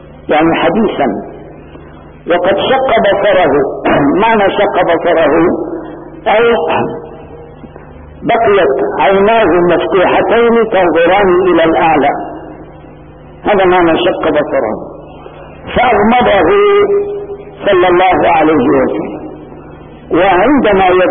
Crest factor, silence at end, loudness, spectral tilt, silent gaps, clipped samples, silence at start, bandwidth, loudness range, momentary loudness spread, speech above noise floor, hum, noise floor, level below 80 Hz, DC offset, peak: 10 dB; 0 s; -10 LUFS; -11.5 dB/octave; none; under 0.1%; 0.1 s; 3.7 kHz; 4 LU; 15 LU; 24 dB; none; -33 dBFS; -36 dBFS; under 0.1%; 0 dBFS